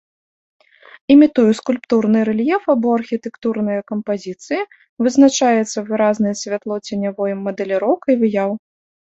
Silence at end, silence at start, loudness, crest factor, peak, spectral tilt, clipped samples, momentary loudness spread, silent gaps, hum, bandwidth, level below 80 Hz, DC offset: 0.6 s; 1.1 s; -17 LUFS; 16 dB; -2 dBFS; -5.5 dB/octave; under 0.1%; 12 LU; 4.89-4.97 s; none; 8.2 kHz; -60 dBFS; under 0.1%